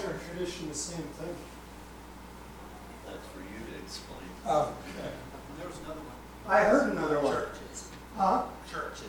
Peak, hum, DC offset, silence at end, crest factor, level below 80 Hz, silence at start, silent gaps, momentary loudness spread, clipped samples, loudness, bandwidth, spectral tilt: -10 dBFS; 60 Hz at -50 dBFS; under 0.1%; 0 s; 22 dB; -52 dBFS; 0 s; none; 20 LU; under 0.1%; -32 LUFS; 19 kHz; -4.5 dB/octave